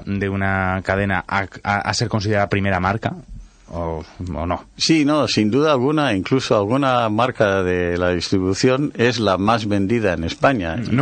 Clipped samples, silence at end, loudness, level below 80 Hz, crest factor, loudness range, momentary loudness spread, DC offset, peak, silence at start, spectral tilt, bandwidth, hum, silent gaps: under 0.1%; 0 s; -19 LUFS; -42 dBFS; 16 dB; 4 LU; 9 LU; under 0.1%; -2 dBFS; 0 s; -5.5 dB/octave; 9.4 kHz; none; none